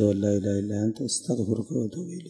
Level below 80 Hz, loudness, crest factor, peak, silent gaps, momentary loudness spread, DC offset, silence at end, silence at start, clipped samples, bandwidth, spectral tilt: -64 dBFS; -27 LUFS; 18 dB; -10 dBFS; none; 5 LU; under 0.1%; 0 s; 0 s; under 0.1%; 11.5 kHz; -6 dB/octave